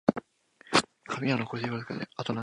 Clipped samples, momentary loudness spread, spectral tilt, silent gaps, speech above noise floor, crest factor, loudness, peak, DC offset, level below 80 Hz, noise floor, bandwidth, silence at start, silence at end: under 0.1%; 11 LU; -4.5 dB/octave; none; 28 dB; 24 dB; -30 LUFS; -6 dBFS; under 0.1%; -68 dBFS; -59 dBFS; 11.5 kHz; 0.05 s; 0 s